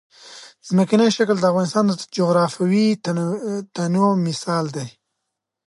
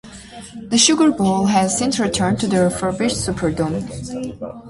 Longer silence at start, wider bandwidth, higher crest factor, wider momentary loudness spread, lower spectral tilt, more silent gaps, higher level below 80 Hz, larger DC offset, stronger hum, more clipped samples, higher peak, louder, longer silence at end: first, 0.25 s vs 0.05 s; about the same, 11.5 kHz vs 11.5 kHz; about the same, 16 dB vs 18 dB; second, 12 LU vs 15 LU; first, -6 dB/octave vs -4 dB/octave; neither; second, -68 dBFS vs -44 dBFS; neither; neither; neither; second, -4 dBFS vs 0 dBFS; about the same, -20 LUFS vs -18 LUFS; first, 0.75 s vs 0 s